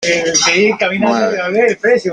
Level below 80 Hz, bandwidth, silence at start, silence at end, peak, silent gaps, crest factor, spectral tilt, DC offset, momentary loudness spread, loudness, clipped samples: -56 dBFS; 11 kHz; 0 s; 0 s; -2 dBFS; none; 12 dB; -2.5 dB/octave; under 0.1%; 4 LU; -12 LUFS; under 0.1%